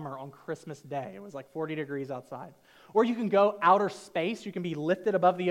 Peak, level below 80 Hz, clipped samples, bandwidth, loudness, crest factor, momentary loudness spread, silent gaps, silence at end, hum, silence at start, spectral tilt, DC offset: -10 dBFS; -78 dBFS; under 0.1%; 15.5 kHz; -29 LUFS; 20 dB; 18 LU; none; 0 s; none; 0 s; -6.5 dB/octave; under 0.1%